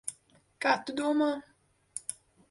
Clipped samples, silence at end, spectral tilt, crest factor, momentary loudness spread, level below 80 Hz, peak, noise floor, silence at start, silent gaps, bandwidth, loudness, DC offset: under 0.1%; 0.4 s; -2.5 dB/octave; 22 dB; 13 LU; -76 dBFS; -12 dBFS; -63 dBFS; 0.05 s; none; 11.5 kHz; -31 LUFS; under 0.1%